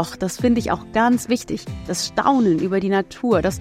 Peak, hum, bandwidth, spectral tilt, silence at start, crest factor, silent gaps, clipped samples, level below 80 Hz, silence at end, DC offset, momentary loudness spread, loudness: -4 dBFS; none; 16 kHz; -5 dB/octave; 0 s; 16 dB; none; under 0.1%; -44 dBFS; 0 s; under 0.1%; 7 LU; -20 LUFS